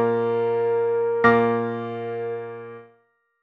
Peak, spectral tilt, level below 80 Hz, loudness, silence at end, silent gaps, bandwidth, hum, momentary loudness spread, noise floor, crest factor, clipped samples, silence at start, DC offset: -4 dBFS; -8.5 dB/octave; -64 dBFS; -22 LUFS; 0.6 s; none; 5.8 kHz; none; 16 LU; -64 dBFS; 20 dB; under 0.1%; 0 s; under 0.1%